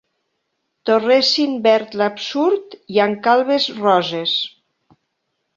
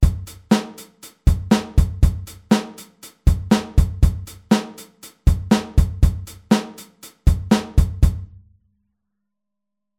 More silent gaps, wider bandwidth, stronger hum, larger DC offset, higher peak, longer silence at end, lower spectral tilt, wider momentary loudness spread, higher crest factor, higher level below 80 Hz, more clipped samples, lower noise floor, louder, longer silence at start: neither; second, 7.6 kHz vs 16 kHz; neither; neither; about the same, -2 dBFS vs -2 dBFS; second, 1.1 s vs 1.75 s; second, -4 dB/octave vs -6.5 dB/octave; second, 7 LU vs 19 LU; about the same, 16 dB vs 18 dB; second, -68 dBFS vs -24 dBFS; neither; second, -73 dBFS vs -83 dBFS; first, -17 LUFS vs -20 LUFS; first, 0.85 s vs 0 s